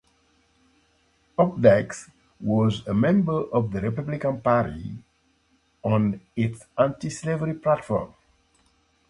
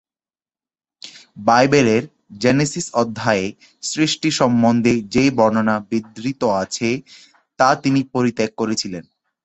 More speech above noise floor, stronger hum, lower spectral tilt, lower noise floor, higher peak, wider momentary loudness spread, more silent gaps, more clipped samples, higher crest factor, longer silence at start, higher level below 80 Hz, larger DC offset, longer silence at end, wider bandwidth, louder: second, 43 dB vs over 72 dB; neither; first, -7.5 dB/octave vs -5 dB/octave; second, -66 dBFS vs under -90 dBFS; about the same, -2 dBFS vs -2 dBFS; about the same, 14 LU vs 14 LU; neither; neither; first, 24 dB vs 18 dB; first, 1.4 s vs 1.05 s; about the same, -52 dBFS vs -52 dBFS; neither; first, 1.05 s vs 0.45 s; first, 11.5 kHz vs 8.4 kHz; second, -24 LUFS vs -18 LUFS